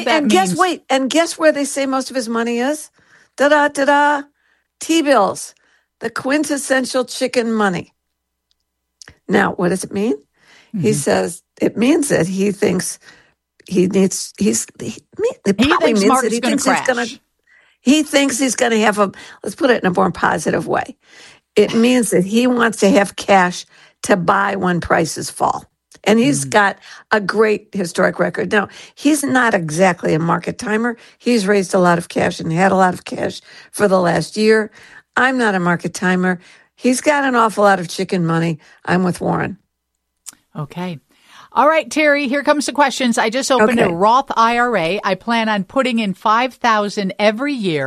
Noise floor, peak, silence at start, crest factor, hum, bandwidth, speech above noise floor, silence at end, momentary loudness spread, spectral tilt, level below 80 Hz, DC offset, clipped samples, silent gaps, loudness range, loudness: -74 dBFS; 0 dBFS; 0 s; 16 dB; none; 13.5 kHz; 58 dB; 0 s; 10 LU; -4.5 dB/octave; -52 dBFS; under 0.1%; under 0.1%; none; 5 LU; -16 LUFS